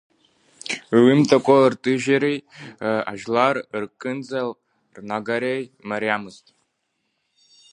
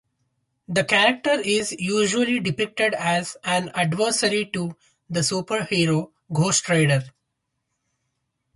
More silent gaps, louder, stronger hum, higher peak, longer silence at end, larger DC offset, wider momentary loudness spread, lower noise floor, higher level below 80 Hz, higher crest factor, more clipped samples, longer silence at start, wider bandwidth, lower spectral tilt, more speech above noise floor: neither; about the same, -21 LUFS vs -22 LUFS; neither; about the same, -2 dBFS vs -4 dBFS; about the same, 1.4 s vs 1.45 s; neither; first, 15 LU vs 7 LU; second, -74 dBFS vs -78 dBFS; second, -68 dBFS vs -62 dBFS; about the same, 20 dB vs 20 dB; neither; about the same, 0.65 s vs 0.7 s; about the same, 10.5 kHz vs 11.5 kHz; first, -6 dB/octave vs -4 dB/octave; about the same, 53 dB vs 56 dB